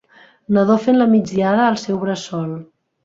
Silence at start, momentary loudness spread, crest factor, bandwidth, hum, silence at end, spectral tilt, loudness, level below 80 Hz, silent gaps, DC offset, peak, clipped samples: 0.5 s; 11 LU; 14 dB; 7.8 kHz; none; 0.4 s; -6.5 dB/octave; -17 LUFS; -58 dBFS; none; under 0.1%; -2 dBFS; under 0.1%